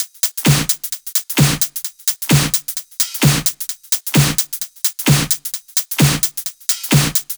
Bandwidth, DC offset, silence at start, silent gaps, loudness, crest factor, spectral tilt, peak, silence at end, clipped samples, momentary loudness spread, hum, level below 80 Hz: over 20 kHz; under 0.1%; 0 s; none; -16 LUFS; 18 dB; -3.5 dB/octave; 0 dBFS; 0 s; under 0.1%; 5 LU; none; -40 dBFS